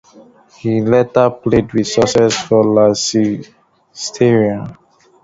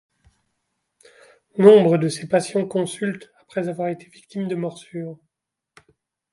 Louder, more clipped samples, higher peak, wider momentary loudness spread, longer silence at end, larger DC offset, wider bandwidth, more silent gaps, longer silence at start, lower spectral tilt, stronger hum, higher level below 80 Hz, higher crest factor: first, -14 LUFS vs -20 LUFS; neither; about the same, 0 dBFS vs 0 dBFS; second, 13 LU vs 21 LU; second, 0.5 s vs 1.2 s; neither; second, 8 kHz vs 11.5 kHz; neither; second, 0.65 s vs 1.55 s; second, -5 dB/octave vs -6.5 dB/octave; neither; first, -44 dBFS vs -68 dBFS; second, 14 dB vs 22 dB